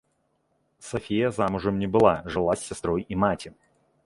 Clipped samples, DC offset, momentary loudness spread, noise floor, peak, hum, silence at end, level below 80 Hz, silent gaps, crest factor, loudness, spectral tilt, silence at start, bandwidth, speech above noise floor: under 0.1%; under 0.1%; 13 LU; -71 dBFS; -4 dBFS; none; 0.55 s; -50 dBFS; none; 22 dB; -25 LUFS; -6 dB/octave; 0.8 s; 11.5 kHz; 47 dB